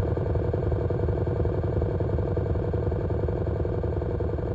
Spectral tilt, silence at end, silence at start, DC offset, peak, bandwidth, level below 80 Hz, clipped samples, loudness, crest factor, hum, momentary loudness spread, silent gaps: -11 dB/octave; 0 s; 0 s; under 0.1%; -12 dBFS; 4.8 kHz; -32 dBFS; under 0.1%; -27 LUFS; 14 dB; none; 2 LU; none